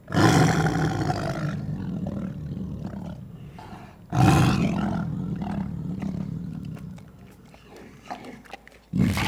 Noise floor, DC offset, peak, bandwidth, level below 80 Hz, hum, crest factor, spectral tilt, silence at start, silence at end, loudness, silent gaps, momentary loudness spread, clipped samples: -48 dBFS; under 0.1%; -4 dBFS; 15.5 kHz; -44 dBFS; none; 22 dB; -6 dB/octave; 0.05 s; 0 s; -25 LUFS; none; 23 LU; under 0.1%